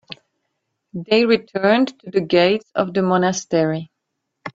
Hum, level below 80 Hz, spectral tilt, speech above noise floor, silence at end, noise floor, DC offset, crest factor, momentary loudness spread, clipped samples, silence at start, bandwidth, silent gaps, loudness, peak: none; -62 dBFS; -5 dB/octave; 59 dB; 0.05 s; -77 dBFS; under 0.1%; 18 dB; 18 LU; under 0.1%; 0.1 s; 7.8 kHz; none; -18 LUFS; -2 dBFS